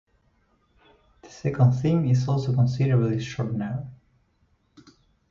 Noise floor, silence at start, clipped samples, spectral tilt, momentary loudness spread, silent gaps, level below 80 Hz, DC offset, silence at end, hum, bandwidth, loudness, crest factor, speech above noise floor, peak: -66 dBFS; 1.25 s; under 0.1%; -8.5 dB/octave; 11 LU; none; -54 dBFS; under 0.1%; 1.35 s; none; 7.2 kHz; -24 LUFS; 18 dB; 44 dB; -8 dBFS